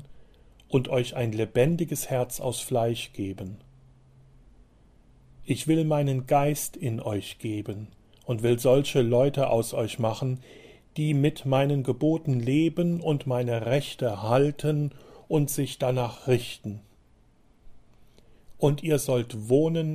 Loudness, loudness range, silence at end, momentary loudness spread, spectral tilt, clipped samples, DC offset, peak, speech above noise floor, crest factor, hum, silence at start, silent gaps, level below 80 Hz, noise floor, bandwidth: -26 LUFS; 6 LU; 0 s; 11 LU; -6 dB/octave; under 0.1%; under 0.1%; -8 dBFS; 34 dB; 18 dB; none; 0 s; none; -54 dBFS; -59 dBFS; 15.5 kHz